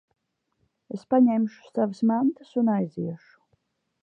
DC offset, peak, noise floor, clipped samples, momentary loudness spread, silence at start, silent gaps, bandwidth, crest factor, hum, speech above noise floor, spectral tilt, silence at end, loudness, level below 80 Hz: under 0.1%; -10 dBFS; -74 dBFS; under 0.1%; 16 LU; 0.95 s; none; 6.8 kHz; 16 dB; none; 50 dB; -9 dB/octave; 0.85 s; -25 LUFS; -76 dBFS